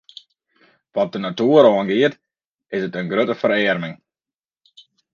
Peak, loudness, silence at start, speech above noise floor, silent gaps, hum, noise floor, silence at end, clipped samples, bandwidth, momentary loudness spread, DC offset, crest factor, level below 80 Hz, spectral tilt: 0 dBFS; -18 LUFS; 0.95 s; over 73 dB; 2.49-2.54 s; none; under -90 dBFS; 1.2 s; under 0.1%; 7 kHz; 13 LU; under 0.1%; 20 dB; -66 dBFS; -7 dB/octave